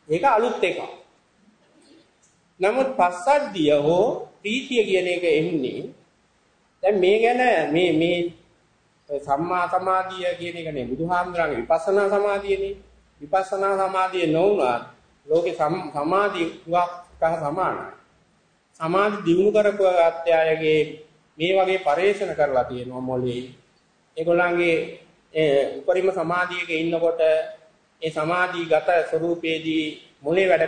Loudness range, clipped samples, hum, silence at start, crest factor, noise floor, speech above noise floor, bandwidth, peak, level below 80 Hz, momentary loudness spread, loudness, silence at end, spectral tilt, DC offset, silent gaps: 3 LU; under 0.1%; none; 0.1 s; 18 dB; -63 dBFS; 41 dB; 9.6 kHz; -6 dBFS; -58 dBFS; 11 LU; -22 LUFS; 0 s; -5.5 dB/octave; under 0.1%; none